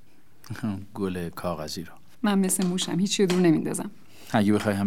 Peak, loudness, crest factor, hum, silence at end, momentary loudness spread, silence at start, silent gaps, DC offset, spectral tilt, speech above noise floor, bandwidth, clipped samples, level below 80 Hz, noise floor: -8 dBFS; -26 LUFS; 18 dB; none; 0 s; 13 LU; 0.5 s; none; 0.7%; -5 dB/octave; 30 dB; 16.5 kHz; under 0.1%; -60 dBFS; -55 dBFS